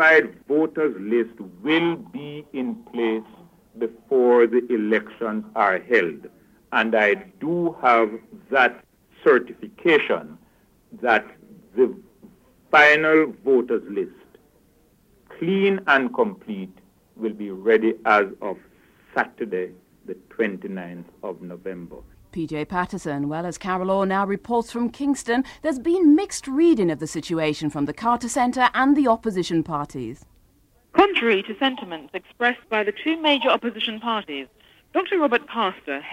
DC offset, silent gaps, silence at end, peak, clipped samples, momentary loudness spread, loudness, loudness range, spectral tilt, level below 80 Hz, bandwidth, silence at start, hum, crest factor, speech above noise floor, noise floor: under 0.1%; none; 0 s; -2 dBFS; under 0.1%; 16 LU; -21 LUFS; 6 LU; -5 dB/octave; -58 dBFS; 13.5 kHz; 0 s; none; 20 dB; 38 dB; -59 dBFS